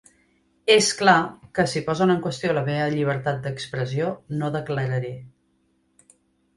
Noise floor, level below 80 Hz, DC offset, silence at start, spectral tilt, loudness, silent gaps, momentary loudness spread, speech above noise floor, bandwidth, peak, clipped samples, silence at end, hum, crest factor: -67 dBFS; -58 dBFS; under 0.1%; 0.65 s; -4.5 dB/octave; -23 LUFS; none; 11 LU; 44 dB; 11.5 kHz; -2 dBFS; under 0.1%; 1.3 s; none; 22 dB